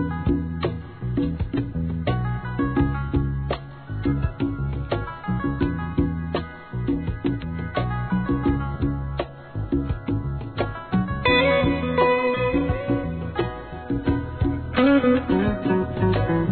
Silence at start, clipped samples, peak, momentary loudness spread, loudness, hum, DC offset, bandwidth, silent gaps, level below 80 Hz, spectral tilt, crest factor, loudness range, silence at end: 0 s; under 0.1%; -6 dBFS; 9 LU; -24 LUFS; none; 0.2%; 4.5 kHz; none; -34 dBFS; -11 dB/octave; 18 dB; 5 LU; 0 s